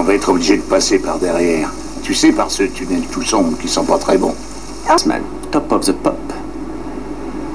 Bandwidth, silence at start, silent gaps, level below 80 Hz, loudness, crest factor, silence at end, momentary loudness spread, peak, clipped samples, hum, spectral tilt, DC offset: 11 kHz; 0 s; none; -34 dBFS; -16 LUFS; 16 dB; 0 s; 13 LU; 0 dBFS; under 0.1%; none; -3.5 dB/octave; 3%